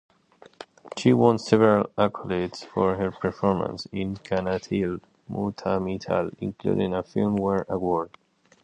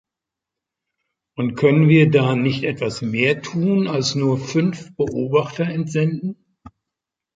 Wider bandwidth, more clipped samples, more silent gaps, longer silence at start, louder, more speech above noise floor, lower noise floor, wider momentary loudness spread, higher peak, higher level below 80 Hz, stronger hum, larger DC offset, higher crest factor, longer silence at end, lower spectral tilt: first, 9.6 kHz vs 7.8 kHz; neither; neither; second, 0.6 s vs 1.4 s; second, -25 LUFS vs -19 LUFS; second, 30 dB vs 67 dB; second, -55 dBFS vs -85 dBFS; about the same, 12 LU vs 11 LU; about the same, -4 dBFS vs -2 dBFS; about the same, -52 dBFS vs -56 dBFS; neither; neither; about the same, 22 dB vs 18 dB; second, 0.55 s vs 0.7 s; about the same, -7 dB/octave vs -6.5 dB/octave